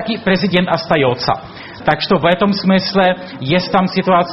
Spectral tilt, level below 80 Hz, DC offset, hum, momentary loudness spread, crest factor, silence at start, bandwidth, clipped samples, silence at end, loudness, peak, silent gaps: -8 dB/octave; -44 dBFS; under 0.1%; none; 6 LU; 14 dB; 0 s; 6 kHz; under 0.1%; 0 s; -15 LUFS; 0 dBFS; none